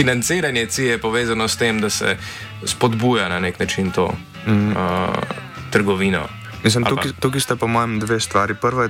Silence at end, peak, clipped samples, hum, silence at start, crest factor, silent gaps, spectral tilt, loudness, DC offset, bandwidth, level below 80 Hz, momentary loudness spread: 0 s; -4 dBFS; under 0.1%; none; 0 s; 14 dB; none; -4.5 dB/octave; -19 LUFS; under 0.1%; 16.5 kHz; -46 dBFS; 7 LU